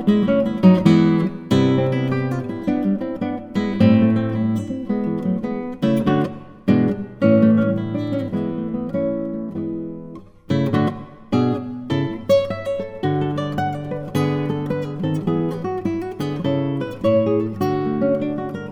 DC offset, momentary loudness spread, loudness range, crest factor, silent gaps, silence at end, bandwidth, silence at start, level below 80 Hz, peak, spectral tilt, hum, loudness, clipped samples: under 0.1%; 11 LU; 4 LU; 18 dB; none; 0 s; 11.5 kHz; 0 s; -50 dBFS; -2 dBFS; -8.5 dB/octave; none; -20 LUFS; under 0.1%